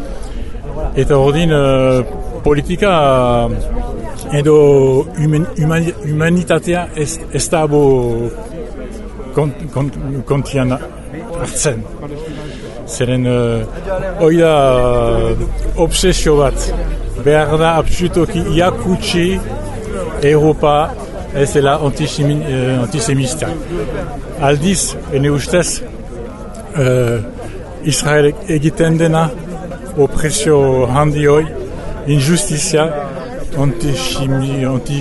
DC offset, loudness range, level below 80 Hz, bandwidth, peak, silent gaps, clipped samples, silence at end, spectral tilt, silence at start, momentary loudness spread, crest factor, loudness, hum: under 0.1%; 5 LU; -26 dBFS; 12 kHz; 0 dBFS; none; under 0.1%; 0 s; -5.5 dB/octave; 0 s; 15 LU; 14 dB; -14 LUFS; none